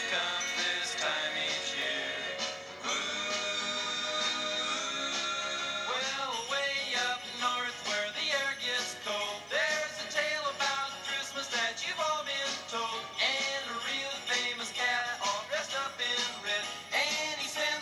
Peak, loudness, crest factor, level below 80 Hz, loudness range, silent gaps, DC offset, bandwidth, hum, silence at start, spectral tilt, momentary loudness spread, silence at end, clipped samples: -16 dBFS; -31 LUFS; 18 dB; -78 dBFS; 1 LU; none; under 0.1%; over 20 kHz; none; 0 s; 0 dB/octave; 4 LU; 0 s; under 0.1%